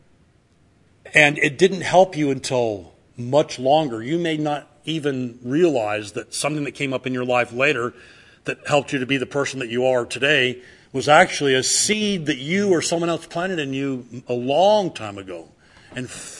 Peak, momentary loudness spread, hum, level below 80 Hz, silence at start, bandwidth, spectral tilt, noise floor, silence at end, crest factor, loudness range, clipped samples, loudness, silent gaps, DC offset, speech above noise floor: 0 dBFS; 14 LU; none; -60 dBFS; 1.05 s; 12 kHz; -4 dB/octave; -58 dBFS; 0 s; 22 dB; 4 LU; under 0.1%; -20 LUFS; none; under 0.1%; 37 dB